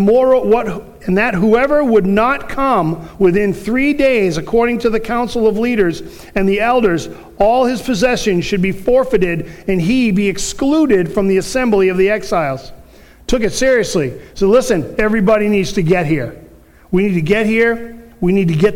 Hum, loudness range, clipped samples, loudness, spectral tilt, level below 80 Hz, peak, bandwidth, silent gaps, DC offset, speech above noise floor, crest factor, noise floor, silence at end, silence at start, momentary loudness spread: none; 2 LU; under 0.1%; -14 LUFS; -6 dB/octave; -34 dBFS; 0 dBFS; 17 kHz; none; under 0.1%; 28 dB; 14 dB; -42 dBFS; 0 s; 0 s; 7 LU